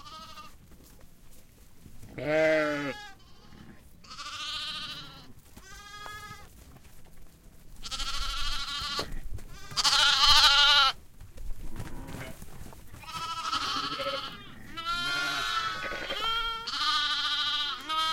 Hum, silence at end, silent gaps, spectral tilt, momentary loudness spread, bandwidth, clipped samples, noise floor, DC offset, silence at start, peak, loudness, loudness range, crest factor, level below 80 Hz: none; 0 s; none; -1.5 dB/octave; 26 LU; 16.5 kHz; under 0.1%; -51 dBFS; under 0.1%; 0 s; -6 dBFS; -26 LUFS; 17 LU; 26 dB; -44 dBFS